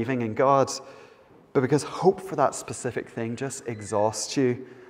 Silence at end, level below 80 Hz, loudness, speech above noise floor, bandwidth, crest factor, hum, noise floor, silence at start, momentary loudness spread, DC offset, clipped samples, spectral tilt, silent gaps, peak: 0 s; -66 dBFS; -26 LUFS; 28 dB; 15.5 kHz; 20 dB; none; -53 dBFS; 0 s; 10 LU; under 0.1%; under 0.1%; -5 dB/octave; none; -6 dBFS